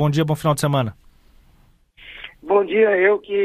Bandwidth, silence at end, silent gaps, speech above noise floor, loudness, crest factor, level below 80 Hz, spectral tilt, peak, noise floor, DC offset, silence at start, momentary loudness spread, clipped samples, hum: 15 kHz; 0 s; none; 37 dB; -18 LUFS; 18 dB; -52 dBFS; -6 dB/octave; -2 dBFS; -55 dBFS; under 0.1%; 0 s; 21 LU; under 0.1%; none